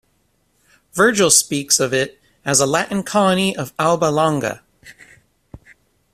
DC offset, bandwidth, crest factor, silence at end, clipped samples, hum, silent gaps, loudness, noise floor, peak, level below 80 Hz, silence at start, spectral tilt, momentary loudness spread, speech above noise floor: under 0.1%; 15.5 kHz; 20 dB; 0.55 s; under 0.1%; none; none; -16 LUFS; -63 dBFS; 0 dBFS; -54 dBFS; 0.95 s; -3 dB/octave; 14 LU; 46 dB